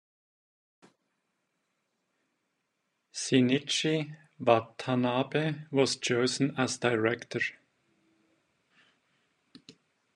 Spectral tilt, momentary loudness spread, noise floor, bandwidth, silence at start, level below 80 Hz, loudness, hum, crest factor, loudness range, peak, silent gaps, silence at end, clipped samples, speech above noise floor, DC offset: -4.5 dB/octave; 7 LU; -80 dBFS; 11 kHz; 3.15 s; -78 dBFS; -29 LUFS; none; 26 dB; 6 LU; -8 dBFS; none; 0.45 s; under 0.1%; 52 dB; under 0.1%